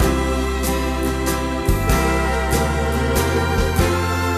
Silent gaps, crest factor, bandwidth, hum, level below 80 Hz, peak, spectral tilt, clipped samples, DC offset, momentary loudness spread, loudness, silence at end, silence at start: none; 14 dB; 14 kHz; none; -24 dBFS; -4 dBFS; -5 dB/octave; under 0.1%; under 0.1%; 3 LU; -19 LUFS; 0 s; 0 s